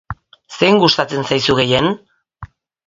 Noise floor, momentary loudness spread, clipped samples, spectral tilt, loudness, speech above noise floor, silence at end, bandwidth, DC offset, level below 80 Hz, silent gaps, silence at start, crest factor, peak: -38 dBFS; 21 LU; under 0.1%; -5 dB/octave; -14 LUFS; 24 dB; 0.4 s; 7.8 kHz; under 0.1%; -44 dBFS; none; 0.1 s; 18 dB; 0 dBFS